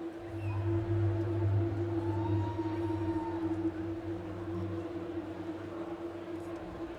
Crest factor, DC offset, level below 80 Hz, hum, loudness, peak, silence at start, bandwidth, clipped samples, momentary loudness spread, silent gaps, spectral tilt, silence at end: 12 dB; under 0.1%; -56 dBFS; none; -36 LUFS; -22 dBFS; 0 s; 7 kHz; under 0.1%; 9 LU; none; -9.5 dB/octave; 0 s